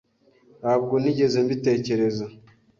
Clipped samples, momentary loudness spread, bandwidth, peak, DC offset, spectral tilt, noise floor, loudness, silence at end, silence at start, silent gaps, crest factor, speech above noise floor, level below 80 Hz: under 0.1%; 10 LU; 7.4 kHz; -8 dBFS; under 0.1%; -7 dB/octave; -58 dBFS; -23 LUFS; 0.45 s; 0.6 s; none; 16 dB; 36 dB; -62 dBFS